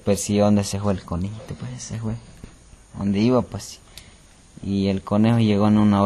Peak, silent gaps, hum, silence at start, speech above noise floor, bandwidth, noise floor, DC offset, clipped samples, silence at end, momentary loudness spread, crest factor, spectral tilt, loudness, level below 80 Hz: -6 dBFS; none; none; 0.05 s; 28 dB; 13 kHz; -49 dBFS; under 0.1%; under 0.1%; 0 s; 17 LU; 16 dB; -6.5 dB/octave; -21 LUFS; -46 dBFS